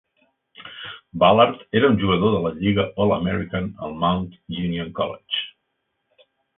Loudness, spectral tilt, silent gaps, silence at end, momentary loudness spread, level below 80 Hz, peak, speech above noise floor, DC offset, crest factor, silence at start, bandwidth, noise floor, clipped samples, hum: -21 LUFS; -11 dB/octave; none; 1.05 s; 18 LU; -46 dBFS; -2 dBFS; 54 dB; under 0.1%; 20 dB; 0.6 s; 4 kHz; -75 dBFS; under 0.1%; none